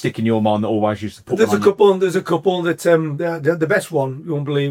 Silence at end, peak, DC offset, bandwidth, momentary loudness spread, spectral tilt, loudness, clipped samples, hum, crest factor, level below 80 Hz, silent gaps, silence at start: 0 s; -2 dBFS; under 0.1%; 16.5 kHz; 8 LU; -6.5 dB/octave; -18 LUFS; under 0.1%; none; 16 dB; -62 dBFS; none; 0 s